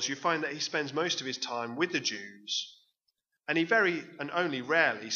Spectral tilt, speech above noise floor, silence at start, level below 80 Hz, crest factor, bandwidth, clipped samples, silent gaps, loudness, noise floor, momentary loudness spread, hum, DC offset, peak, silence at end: -2.5 dB/octave; 50 dB; 0 s; -86 dBFS; 22 dB; 7.4 kHz; under 0.1%; none; -30 LUFS; -81 dBFS; 8 LU; none; under 0.1%; -10 dBFS; 0 s